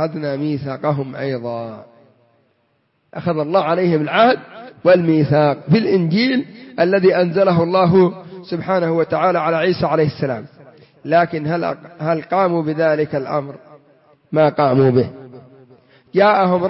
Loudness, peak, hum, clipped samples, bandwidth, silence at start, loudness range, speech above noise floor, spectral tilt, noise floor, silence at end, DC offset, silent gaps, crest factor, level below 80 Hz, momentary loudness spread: -17 LUFS; -2 dBFS; none; under 0.1%; 5.8 kHz; 0 s; 5 LU; 48 dB; -11 dB/octave; -64 dBFS; 0 s; under 0.1%; none; 16 dB; -58 dBFS; 12 LU